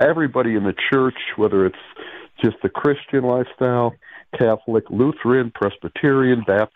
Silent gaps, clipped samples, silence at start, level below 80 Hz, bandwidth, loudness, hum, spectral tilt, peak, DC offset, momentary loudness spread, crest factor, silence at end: none; under 0.1%; 0 s; -56 dBFS; 4.4 kHz; -19 LUFS; none; -9 dB/octave; -4 dBFS; under 0.1%; 7 LU; 14 dB; 0.1 s